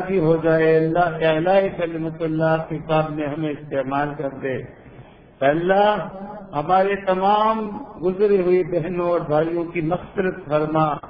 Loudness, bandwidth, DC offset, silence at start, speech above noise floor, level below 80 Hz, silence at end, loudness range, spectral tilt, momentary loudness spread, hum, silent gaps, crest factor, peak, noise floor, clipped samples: -21 LUFS; 5.2 kHz; under 0.1%; 0 s; 24 dB; -50 dBFS; 0 s; 4 LU; -10 dB/octave; 10 LU; none; none; 16 dB; -4 dBFS; -44 dBFS; under 0.1%